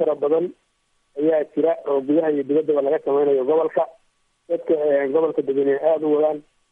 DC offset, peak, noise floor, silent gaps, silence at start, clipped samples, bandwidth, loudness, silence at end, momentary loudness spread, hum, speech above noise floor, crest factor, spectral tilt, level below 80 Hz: under 0.1%; -6 dBFS; -65 dBFS; none; 0 s; under 0.1%; 3.7 kHz; -21 LUFS; 0.3 s; 7 LU; none; 45 dB; 14 dB; -9 dB/octave; -74 dBFS